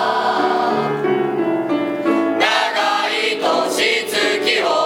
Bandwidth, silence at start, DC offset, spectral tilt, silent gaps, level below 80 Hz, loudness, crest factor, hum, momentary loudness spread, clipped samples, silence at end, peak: 17.5 kHz; 0 s; under 0.1%; -3 dB/octave; none; -66 dBFS; -17 LUFS; 16 dB; none; 3 LU; under 0.1%; 0 s; -2 dBFS